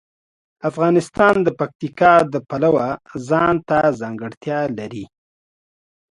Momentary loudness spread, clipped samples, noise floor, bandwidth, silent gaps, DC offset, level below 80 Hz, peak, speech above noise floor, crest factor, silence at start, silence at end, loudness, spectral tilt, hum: 15 LU; under 0.1%; under -90 dBFS; 11.5 kHz; 1.75-1.79 s, 4.37-4.41 s; under 0.1%; -54 dBFS; 0 dBFS; over 72 dB; 18 dB; 0.65 s; 1.05 s; -18 LUFS; -7 dB/octave; none